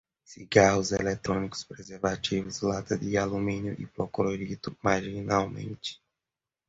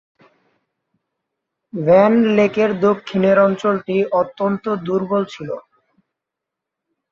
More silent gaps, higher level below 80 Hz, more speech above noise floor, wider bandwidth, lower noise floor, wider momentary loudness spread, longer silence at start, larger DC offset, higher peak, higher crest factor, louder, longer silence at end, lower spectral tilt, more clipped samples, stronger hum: neither; first, -54 dBFS vs -60 dBFS; second, 61 dB vs 67 dB; first, 8 kHz vs 7.2 kHz; first, -90 dBFS vs -83 dBFS; about the same, 14 LU vs 13 LU; second, 0.3 s vs 1.75 s; neither; second, -6 dBFS vs -2 dBFS; first, 24 dB vs 16 dB; second, -29 LUFS vs -17 LUFS; second, 0.75 s vs 1.5 s; second, -5 dB/octave vs -7.5 dB/octave; neither; neither